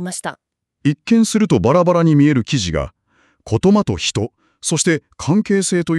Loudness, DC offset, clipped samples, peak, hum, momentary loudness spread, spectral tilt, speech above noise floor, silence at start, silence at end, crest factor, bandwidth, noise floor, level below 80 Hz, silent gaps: -16 LUFS; under 0.1%; under 0.1%; -2 dBFS; none; 12 LU; -5.5 dB/octave; 44 dB; 0 s; 0 s; 14 dB; 12.5 kHz; -59 dBFS; -42 dBFS; none